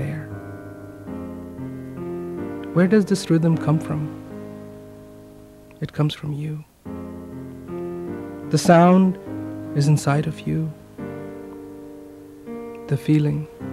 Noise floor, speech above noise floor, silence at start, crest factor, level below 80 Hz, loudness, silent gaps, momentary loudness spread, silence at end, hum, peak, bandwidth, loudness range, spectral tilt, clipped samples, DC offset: -45 dBFS; 26 dB; 0 s; 20 dB; -54 dBFS; -22 LUFS; none; 20 LU; 0 s; none; -2 dBFS; 13.5 kHz; 10 LU; -7 dB/octave; under 0.1%; under 0.1%